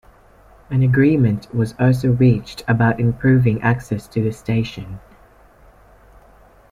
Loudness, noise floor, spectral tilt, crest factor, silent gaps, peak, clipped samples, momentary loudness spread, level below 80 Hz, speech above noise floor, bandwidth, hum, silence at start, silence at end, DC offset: -18 LUFS; -49 dBFS; -8.5 dB/octave; 14 dB; none; -4 dBFS; under 0.1%; 9 LU; -44 dBFS; 32 dB; 11.5 kHz; none; 0.7 s; 1.75 s; under 0.1%